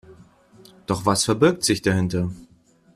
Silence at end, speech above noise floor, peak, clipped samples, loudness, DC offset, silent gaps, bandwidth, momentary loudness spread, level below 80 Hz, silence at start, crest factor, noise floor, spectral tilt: 0.5 s; 30 dB; -4 dBFS; under 0.1%; -21 LUFS; under 0.1%; none; 15 kHz; 14 LU; -52 dBFS; 0.1 s; 20 dB; -51 dBFS; -4.5 dB/octave